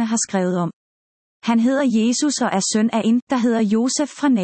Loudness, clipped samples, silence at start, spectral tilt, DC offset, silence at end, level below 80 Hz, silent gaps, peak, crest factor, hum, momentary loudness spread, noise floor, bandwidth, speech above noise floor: -19 LUFS; under 0.1%; 0 s; -4.5 dB/octave; under 0.1%; 0 s; -68 dBFS; 0.73-1.42 s, 3.22-3.27 s; -6 dBFS; 12 dB; none; 4 LU; under -90 dBFS; 8.8 kHz; over 72 dB